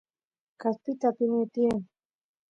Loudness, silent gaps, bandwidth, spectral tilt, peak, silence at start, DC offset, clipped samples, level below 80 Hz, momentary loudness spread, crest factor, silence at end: -29 LUFS; none; 7.8 kHz; -8 dB/octave; -12 dBFS; 0.6 s; under 0.1%; under 0.1%; -66 dBFS; 7 LU; 18 dB; 0.65 s